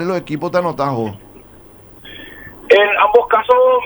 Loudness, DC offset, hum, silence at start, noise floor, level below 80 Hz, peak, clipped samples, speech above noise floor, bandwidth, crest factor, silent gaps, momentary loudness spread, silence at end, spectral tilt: -14 LUFS; under 0.1%; none; 0 s; -42 dBFS; -50 dBFS; 0 dBFS; under 0.1%; 28 dB; over 20 kHz; 16 dB; none; 23 LU; 0 s; -6 dB/octave